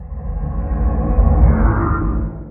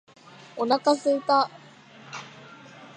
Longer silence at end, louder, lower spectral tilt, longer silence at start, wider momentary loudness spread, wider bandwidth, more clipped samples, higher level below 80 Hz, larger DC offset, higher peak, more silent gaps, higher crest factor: about the same, 0 s vs 0.1 s; first, -18 LUFS vs -24 LUFS; first, -12 dB/octave vs -4 dB/octave; second, 0 s vs 0.55 s; second, 11 LU vs 24 LU; second, 2.5 kHz vs 9.6 kHz; neither; first, -16 dBFS vs -84 dBFS; neither; first, 0 dBFS vs -8 dBFS; neither; about the same, 16 dB vs 20 dB